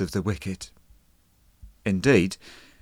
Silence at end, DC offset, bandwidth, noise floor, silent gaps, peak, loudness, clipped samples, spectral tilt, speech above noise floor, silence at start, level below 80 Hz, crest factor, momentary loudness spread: 0.25 s; under 0.1%; 16 kHz; -61 dBFS; none; -6 dBFS; -25 LUFS; under 0.1%; -6 dB/octave; 37 dB; 0 s; -50 dBFS; 20 dB; 19 LU